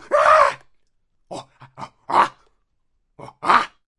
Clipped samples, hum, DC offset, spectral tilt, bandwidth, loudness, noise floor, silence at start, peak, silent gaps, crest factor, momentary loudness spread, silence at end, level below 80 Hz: under 0.1%; none; under 0.1%; -3 dB/octave; 11.5 kHz; -17 LUFS; -68 dBFS; 0.1 s; 0 dBFS; none; 22 dB; 24 LU; 0.3 s; -58 dBFS